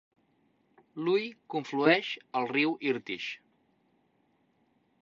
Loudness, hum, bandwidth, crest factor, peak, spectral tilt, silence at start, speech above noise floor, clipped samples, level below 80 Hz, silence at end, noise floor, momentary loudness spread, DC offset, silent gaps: -30 LUFS; none; 7.4 kHz; 24 dB; -8 dBFS; -5.5 dB/octave; 0.95 s; 41 dB; under 0.1%; -80 dBFS; 1.7 s; -71 dBFS; 12 LU; under 0.1%; none